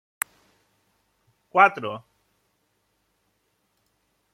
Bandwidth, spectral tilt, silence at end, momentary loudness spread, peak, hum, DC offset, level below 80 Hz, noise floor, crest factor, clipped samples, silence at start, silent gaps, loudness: 16.5 kHz; -3 dB/octave; 2.35 s; 16 LU; -2 dBFS; none; under 0.1%; -78 dBFS; -72 dBFS; 28 dB; under 0.1%; 1.55 s; none; -22 LUFS